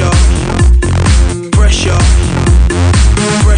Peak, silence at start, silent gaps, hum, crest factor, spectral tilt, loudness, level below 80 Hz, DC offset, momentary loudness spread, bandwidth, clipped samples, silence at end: 0 dBFS; 0 s; none; none; 8 dB; -5 dB/octave; -10 LUFS; -10 dBFS; under 0.1%; 2 LU; 10 kHz; under 0.1%; 0 s